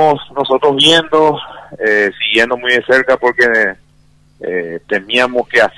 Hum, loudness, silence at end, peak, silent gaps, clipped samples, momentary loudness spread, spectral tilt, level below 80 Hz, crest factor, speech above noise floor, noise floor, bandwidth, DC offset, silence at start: none; -12 LUFS; 0.05 s; 0 dBFS; none; under 0.1%; 12 LU; -3.5 dB/octave; -50 dBFS; 14 dB; 37 dB; -49 dBFS; 12 kHz; under 0.1%; 0 s